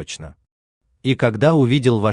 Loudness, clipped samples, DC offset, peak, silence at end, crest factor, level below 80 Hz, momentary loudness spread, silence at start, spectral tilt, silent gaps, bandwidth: -17 LUFS; under 0.1%; under 0.1%; -4 dBFS; 0 s; 16 dB; -50 dBFS; 16 LU; 0 s; -7 dB/octave; 0.52-0.81 s; 10.5 kHz